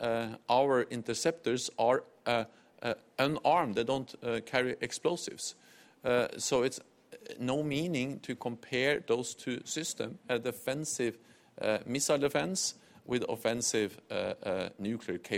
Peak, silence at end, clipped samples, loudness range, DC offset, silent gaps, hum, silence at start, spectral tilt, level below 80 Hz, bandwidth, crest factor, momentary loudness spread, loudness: -12 dBFS; 0 s; under 0.1%; 2 LU; under 0.1%; none; none; 0 s; -3.5 dB/octave; -70 dBFS; 17 kHz; 22 dB; 9 LU; -33 LUFS